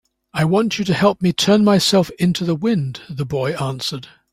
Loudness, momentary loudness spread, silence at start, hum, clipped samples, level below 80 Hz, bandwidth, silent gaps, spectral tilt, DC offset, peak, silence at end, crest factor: -18 LUFS; 12 LU; 0.35 s; none; under 0.1%; -52 dBFS; 16 kHz; none; -5.5 dB/octave; under 0.1%; -2 dBFS; 0.25 s; 16 dB